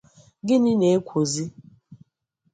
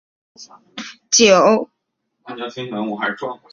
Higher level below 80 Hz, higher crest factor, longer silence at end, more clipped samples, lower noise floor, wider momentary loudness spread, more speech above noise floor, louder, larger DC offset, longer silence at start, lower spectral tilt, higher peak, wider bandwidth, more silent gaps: about the same, -64 dBFS vs -62 dBFS; about the same, 16 dB vs 18 dB; first, 0.6 s vs 0.15 s; neither; about the same, -72 dBFS vs -73 dBFS; second, 14 LU vs 23 LU; second, 51 dB vs 55 dB; second, -22 LUFS vs -16 LUFS; neither; about the same, 0.45 s vs 0.4 s; first, -6 dB/octave vs -2.5 dB/octave; second, -8 dBFS vs 0 dBFS; first, 9.6 kHz vs 7.8 kHz; neither